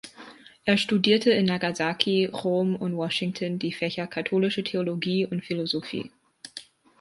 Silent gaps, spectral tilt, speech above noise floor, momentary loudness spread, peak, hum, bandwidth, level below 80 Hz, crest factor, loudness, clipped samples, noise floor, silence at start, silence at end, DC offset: none; -5.5 dB/octave; 23 dB; 20 LU; -4 dBFS; none; 11.5 kHz; -68 dBFS; 22 dB; -26 LUFS; under 0.1%; -48 dBFS; 0.05 s; 0.4 s; under 0.1%